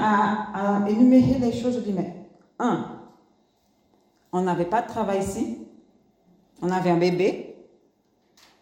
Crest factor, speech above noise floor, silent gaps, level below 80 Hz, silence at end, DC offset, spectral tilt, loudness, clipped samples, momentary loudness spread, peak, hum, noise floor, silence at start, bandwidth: 18 dB; 43 dB; none; -56 dBFS; 1.05 s; under 0.1%; -7 dB/octave; -23 LUFS; under 0.1%; 17 LU; -6 dBFS; none; -65 dBFS; 0 s; 11 kHz